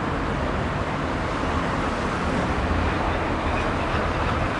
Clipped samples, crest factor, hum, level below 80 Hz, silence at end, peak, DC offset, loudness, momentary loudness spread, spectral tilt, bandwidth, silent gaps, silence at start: under 0.1%; 14 dB; none; -32 dBFS; 0 s; -10 dBFS; under 0.1%; -25 LUFS; 2 LU; -6 dB/octave; 11 kHz; none; 0 s